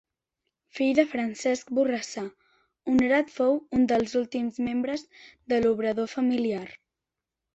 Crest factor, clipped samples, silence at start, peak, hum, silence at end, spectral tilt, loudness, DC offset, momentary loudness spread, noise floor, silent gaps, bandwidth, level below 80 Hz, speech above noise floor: 20 dB; under 0.1%; 0.75 s; -8 dBFS; none; 0.8 s; -5 dB/octave; -26 LUFS; under 0.1%; 12 LU; -87 dBFS; none; 8.2 kHz; -60 dBFS; 62 dB